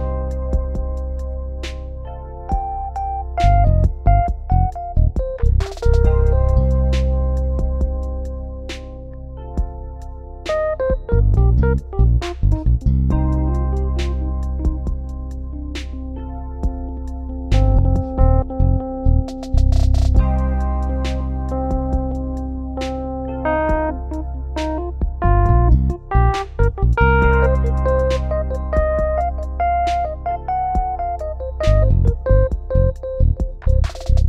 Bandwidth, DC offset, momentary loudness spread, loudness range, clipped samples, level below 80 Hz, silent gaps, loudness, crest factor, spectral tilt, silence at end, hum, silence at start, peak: 7.6 kHz; under 0.1%; 13 LU; 6 LU; under 0.1%; -20 dBFS; none; -20 LUFS; 16 dB; -8 dB/octave; 0 s; none; 0 s; 0 dBFS